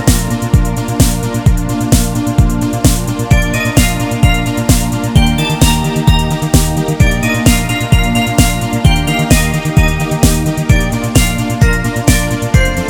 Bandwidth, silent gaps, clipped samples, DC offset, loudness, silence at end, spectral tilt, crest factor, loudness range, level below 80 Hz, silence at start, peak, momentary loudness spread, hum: 19.5 kHz; none; 0.5%; under 0.1%; -12 LUFS; 0 s; -5 dB/octave; 12 dB; 1 LU; -16 dBFS; 0 s; 0 dBFS; 2 LU; none